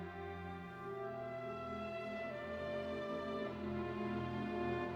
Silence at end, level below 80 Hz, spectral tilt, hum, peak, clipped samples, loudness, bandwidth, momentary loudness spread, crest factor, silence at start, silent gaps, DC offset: 0 s; -64 dBFS; -7.5 dB/octave; none; -28 dBFS; under 0.1%; -43 LUFS; 11 kHz; 6 LU; 14 dB; 0 s; none; under 0.1%